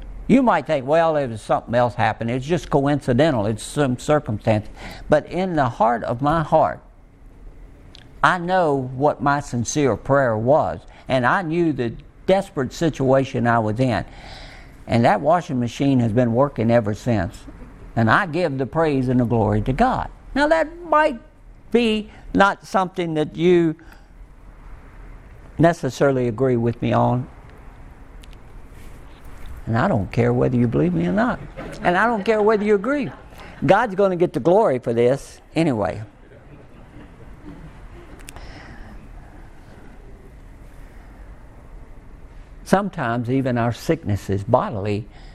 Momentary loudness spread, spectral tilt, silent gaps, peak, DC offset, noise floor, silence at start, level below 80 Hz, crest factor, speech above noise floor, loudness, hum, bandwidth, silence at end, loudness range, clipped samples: 13 LU; -6.5 dB/octave; none; 0 dBFS; under 0.1%; -45 dBFS; 0 s; -42 dBFS; 20 dB; 26 dB; -20 LUFS; none; 13.5 kHz; 0 s; 5 LU; under 0.1%